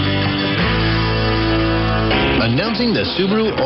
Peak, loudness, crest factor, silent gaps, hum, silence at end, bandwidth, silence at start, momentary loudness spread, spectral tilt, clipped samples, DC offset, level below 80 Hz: -4 dBFS; -16 LUFS; 12 dB; none; none; 0 s; 6 kHz; 0 s; 2 LU; -8.5 dB/octave; under 0.1%; under 0.1%; -28 dBFS